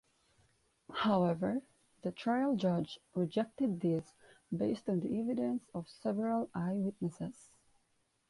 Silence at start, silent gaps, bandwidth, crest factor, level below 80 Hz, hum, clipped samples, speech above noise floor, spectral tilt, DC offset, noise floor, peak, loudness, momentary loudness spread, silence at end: 0.9 s; none; 11.5 kHz; 16 dB; -72 dBFS; none; under 0.1%; 42 dB; -7.5 dB/octave; under 0.1%; -77 dBFS; -20 dBFS; -36 LUFS; 11 LU; 1 s